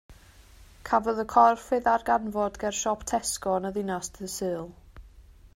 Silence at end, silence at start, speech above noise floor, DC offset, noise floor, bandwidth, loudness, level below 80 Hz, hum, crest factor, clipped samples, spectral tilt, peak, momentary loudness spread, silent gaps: 0.1 s; 0.1 s; 26 dB; under 0.1%; -52 dBFS; 16 kHz; -27 LUFS; -52 dBFS; none; 22 dB; under 0.1%; -3.5 dB/octave; -6 dBFS; 13 LU; none